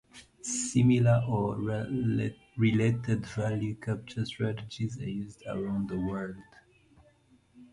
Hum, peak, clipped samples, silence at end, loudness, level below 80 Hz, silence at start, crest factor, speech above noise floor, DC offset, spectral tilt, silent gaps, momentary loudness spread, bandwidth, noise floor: none; -14 dBFS; under 0.1%; 0.1 s; -30 LUFS; -56 dBFS; 0.15 s; 18 dB; 34 dB; under 0.1%; -6.5 dB/octave; none; 12 LU; 11.5 kHz; -63 dBFS